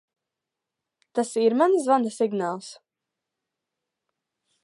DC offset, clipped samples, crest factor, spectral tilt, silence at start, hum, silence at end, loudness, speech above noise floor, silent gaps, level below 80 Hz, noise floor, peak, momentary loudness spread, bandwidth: under 0.1%; under 0.1%; 20 dB; -5 dB/octave; 1.15 s; none; 1.9 s; -23 LUFS; 63 dB; none; -84 dBFS; -86 dBFS; -8 dBFS; 13 LU; 11.5 kHz